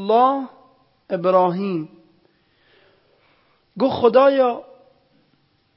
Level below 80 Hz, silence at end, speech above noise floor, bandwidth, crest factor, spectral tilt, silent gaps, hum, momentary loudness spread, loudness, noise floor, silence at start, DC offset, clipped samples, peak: -64 dBFS; 1.15 s; 45 dB; 5.8 kHz; 18 dB; -11 dB/octave; none; none; 16 LU; -18 LUFS; -63 dBFS; 0 s; under 0.1%; under 0.1%; -2 dBFS